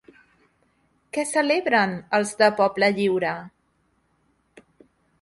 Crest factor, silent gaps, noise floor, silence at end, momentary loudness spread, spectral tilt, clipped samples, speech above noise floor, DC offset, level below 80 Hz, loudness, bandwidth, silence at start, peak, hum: 20 dB; none; -68 dBFS; 1.75 s; 9 LU; -4 dB/octave; under 0.1%; 46 dB; under 0.1%; -66 dBFS; -22 LUFS; 11.5 kHz; 1.15 s; -4 dBFS; none